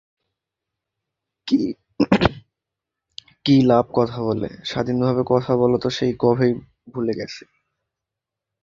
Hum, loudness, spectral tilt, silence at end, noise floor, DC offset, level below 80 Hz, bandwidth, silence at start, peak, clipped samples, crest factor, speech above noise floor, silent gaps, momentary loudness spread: none; -20 LUFS; -7 dB/octave; 1.25 s; -85 dBFS; under 0.1%; -48 dBFS; 7.6 kHz; 1.45 s; -2 dBFS; under 0.1%; 20 dB; 66 dB; none; 13 LU